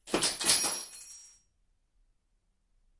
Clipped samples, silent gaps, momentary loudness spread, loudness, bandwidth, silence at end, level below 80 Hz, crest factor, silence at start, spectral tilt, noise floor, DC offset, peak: under 0.1%; none; 21 LU; -27 LUFS; 11.5 kHz; 1.75 s; -64 dBFS; 24 dB; 0.05 s; -0.5 dB/octave; -74 dBFS; under 0.1%; -12 dBFS